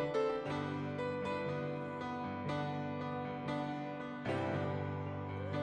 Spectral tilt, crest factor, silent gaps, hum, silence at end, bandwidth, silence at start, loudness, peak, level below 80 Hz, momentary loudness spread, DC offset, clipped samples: -7.5 dB/octave; 14 dB; none; none; 0 s; 9.4 kHz; 0 s; -39 LUFS; -24 dBFS; -68 dBFS; 5 LU; under 0.1%; under 0.1%